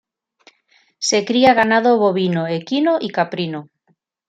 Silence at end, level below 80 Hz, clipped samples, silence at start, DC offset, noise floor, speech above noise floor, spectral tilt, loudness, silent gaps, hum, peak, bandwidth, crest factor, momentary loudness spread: 0.65 s; -64 dBFS; under 0.1%; 1 s; under 0.1%; -65 dBFS; 48 dB; -4.5 dB/octave; -17 LUFS; none; none; -2 dBFS; 9.2 kHz; 16 dB; 10 LU